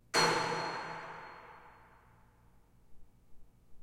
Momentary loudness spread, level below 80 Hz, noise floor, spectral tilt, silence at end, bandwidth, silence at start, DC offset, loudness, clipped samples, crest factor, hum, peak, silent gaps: 25 LU; -64 dBFS; -64 dBFS; -2.5 dB/octave; 0 s; 16 kHz; 0.15 s; under 0.1%; -34 LUFS; under 0.1%; 24 dB; none; -16 dBFS; none